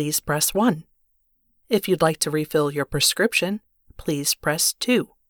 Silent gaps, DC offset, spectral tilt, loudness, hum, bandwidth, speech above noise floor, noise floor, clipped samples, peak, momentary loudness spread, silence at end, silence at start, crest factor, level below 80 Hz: none; under 0.1%; -3 dB/octave; -21 LUFS; none; over 20 kHz; 45 dB; -67 dBFS; under 0.1%; -6 dBFS; 9 LU; 0.25 s; 0 s; 18 dB; -50 dBFS